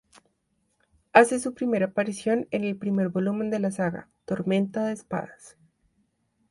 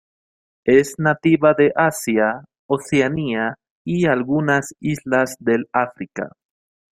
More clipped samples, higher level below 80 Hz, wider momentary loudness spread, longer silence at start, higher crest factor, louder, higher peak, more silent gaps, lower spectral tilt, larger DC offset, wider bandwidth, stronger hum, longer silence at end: neither; second, -66 dBFS vs -56 dBFS; about the same, 13 LU vs 11 LU; first, 1.15 s vs 0.65 s; first, 26 dB vs 18 dB; second, -26 LUFS vs -19 LUFS; about the same, -2 dBFS vs -2 dBFS; second, none vs 2.59-2.69 s, 3.70-3.85 s; about the same, -6 dB/octave vs -6 dB/octave; neither; second, 11.5 kHz vs 16 kHz; neither; first, 1 s vs 0.6 s